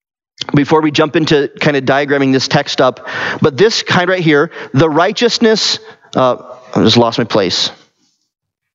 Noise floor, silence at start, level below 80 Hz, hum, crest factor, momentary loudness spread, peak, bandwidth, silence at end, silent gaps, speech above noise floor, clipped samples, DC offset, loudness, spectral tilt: -60 dBFS; 0.4 s; -50 dBFS; none; 12 dB; 7 LU; 0 dBFS; 8 kHz; 1 s; none; 48 dB; under 0.1%; under 0.1%; -12 LUFS; -5 dB/octave